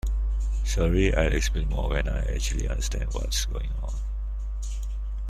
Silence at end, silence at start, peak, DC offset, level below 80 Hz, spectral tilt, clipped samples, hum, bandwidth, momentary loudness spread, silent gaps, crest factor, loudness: 0 s; 0.05 s; -8 dBFS; under 0.1%; -26 dBFS; -5 dB/octave; under 0.1%; none; 13.5 kHz; 11 LU; none; 18 dB; -28 LUFS